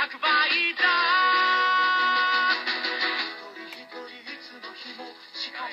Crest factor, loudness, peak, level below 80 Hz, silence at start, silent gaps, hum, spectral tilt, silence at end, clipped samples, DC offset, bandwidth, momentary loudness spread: 16 dB; -22 LUFS; -10 dBFS; under -90 dBFS; 0 s; none; none; -1 dB/octave; 0 s; under 0.1%; under 0.1%; 7.6 kHz; 19 LU